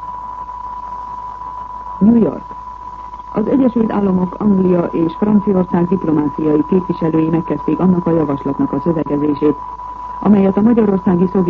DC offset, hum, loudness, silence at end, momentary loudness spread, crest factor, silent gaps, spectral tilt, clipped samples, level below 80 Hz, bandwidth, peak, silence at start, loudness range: under 0.1%; none; -15 LUFS; 0 s; 15 LU; 14 dB; none; -11 dB/octave; under 0.1%; -40 dBFS; 4.5 kHz; -2 dBFS; 0 s; 3 LU